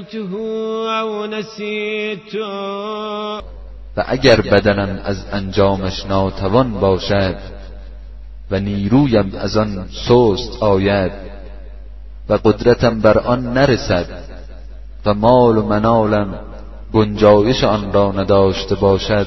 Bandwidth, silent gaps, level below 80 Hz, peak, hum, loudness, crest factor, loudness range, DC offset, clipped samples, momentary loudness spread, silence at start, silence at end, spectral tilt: 6.2 kHz; none; -32 dBFS; 0 dBFS; none; -16 LUFS; 16 dB; 4 LU; 1%; under 0.1%; 17 LU; 0 s; 0 s; -7 dB/octave